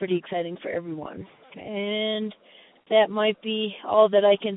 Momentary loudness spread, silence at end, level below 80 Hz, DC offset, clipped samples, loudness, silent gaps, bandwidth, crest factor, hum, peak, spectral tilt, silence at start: 18 LU; 0 s; -68 dBFS; under 0.1%; under 0.1%; -24 LUFS; none; 4 kHz; 18 dB; none; -6 dBFS; -9.5 dB/octave; 0 s